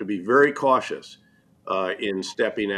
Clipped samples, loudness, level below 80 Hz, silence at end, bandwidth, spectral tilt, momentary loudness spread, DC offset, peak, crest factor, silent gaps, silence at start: under 0.1%; -23 LUFS; -68 dBFS; 0 s; 11 kHz; -4.5 dB/octave; 11 LU; under 0.1%; -6 dBFS; 18 dB; none; 0 s